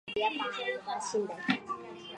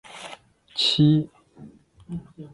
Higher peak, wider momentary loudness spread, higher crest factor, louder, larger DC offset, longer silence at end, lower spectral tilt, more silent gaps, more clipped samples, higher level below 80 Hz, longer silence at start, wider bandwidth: second, -12 dBFS vs -8 dBFS; second, 6 LU vs 21 LU; about the same, 22 dB vs 18 dB; second, -34 LUFS vs -21 LUFS; neither; about the same, 0 s vs 0.1 s; second, -3.5 dB/octave vs -6 dB/octave; neither; neither; second, -74 dBFS vs -58 dBFS; about the same, 0.05 s vs 0.15 s; about the same, 11 kHz vs 11.5 kHz